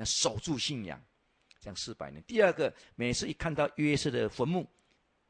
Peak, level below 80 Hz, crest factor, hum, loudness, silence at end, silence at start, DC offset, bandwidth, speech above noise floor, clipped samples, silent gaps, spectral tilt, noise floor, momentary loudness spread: -12 dBFS; -56 dBFS; 20 dB; none; -32 LUFS; 0.65 s; 0 s; under 0.1%; 10 kHz; 36 dB; under 0.1%; none; -4 dB/octave; -67 dBFS; 17 LU